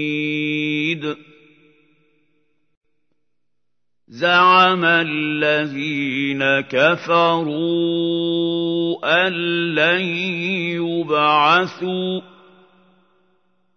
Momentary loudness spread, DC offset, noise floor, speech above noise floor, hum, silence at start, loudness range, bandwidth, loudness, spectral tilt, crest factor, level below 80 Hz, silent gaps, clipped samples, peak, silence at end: 9 LU; under 0.1%; -81 dBFS; 63 dB; none; 0 s; 9 LU; 6.6 kHz; -18 LUFS; -6 dB/octave; 18 dB; -74 dBFS; 2.77-2.81 s; under 0.1%; -2 dBFS; 1.55 s